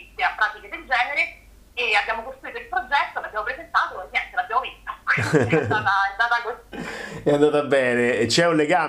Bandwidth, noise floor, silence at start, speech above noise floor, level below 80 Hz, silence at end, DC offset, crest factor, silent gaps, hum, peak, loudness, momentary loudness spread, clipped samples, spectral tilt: 15 kHz; -44 dBFS; 0 s; 24 dB; -52 dBFS; 0 s; under 0.1%; 18 dB; none; none; -4 dBFS; -22 LUFS; 14 LU; under 0.1%; -4.5 dB/octave